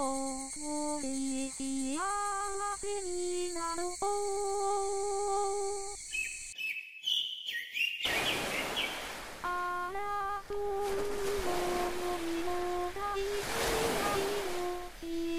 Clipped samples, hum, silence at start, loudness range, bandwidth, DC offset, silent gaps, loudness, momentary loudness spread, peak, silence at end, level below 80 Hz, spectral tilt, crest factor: under 0.1%; none; 0 s; 2 LU; 16.5 kHz; 0.5%; none; -34 LUFS; 6 LU; -18 dBFS; 0 s; -54 dBFS; -2 dB/octave; 16 dB